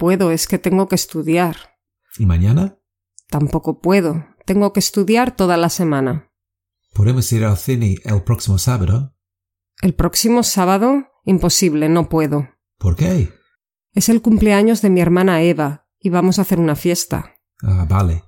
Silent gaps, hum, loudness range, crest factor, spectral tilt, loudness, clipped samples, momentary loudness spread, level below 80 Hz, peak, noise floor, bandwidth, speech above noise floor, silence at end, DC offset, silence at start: none; none; 3 LU; 14 dB; -5.5 dB/octave; -16 LUFS; under 0.1%; 9 LU; -34 dBFS; -2 dBFS; -83 dBFS; 17 kHz; 69 dB; 0.1 s; under 0.1%; 0 s